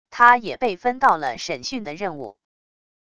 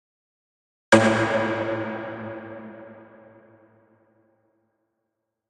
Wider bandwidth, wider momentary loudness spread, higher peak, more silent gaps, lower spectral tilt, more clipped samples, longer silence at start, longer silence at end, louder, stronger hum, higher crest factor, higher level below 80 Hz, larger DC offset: about the same, 10 kHz vs 11 kHz; second, 15 LU vs 24 LU; about the same, 0 dBFS vs -2 dBFS; neither; second, -3.5 dB/octave vs -5 dB/octave; neither; second, 0.1 s vs 0.9 s; second, 0.8 s vs 2.45 s; about the same, -20 LUFS vs -22 LUFS; neither; about the same, 22 dB vs 26 dB; first, -58 dBFS vs -64 dBFS; first, 0.4% vs under 0.1%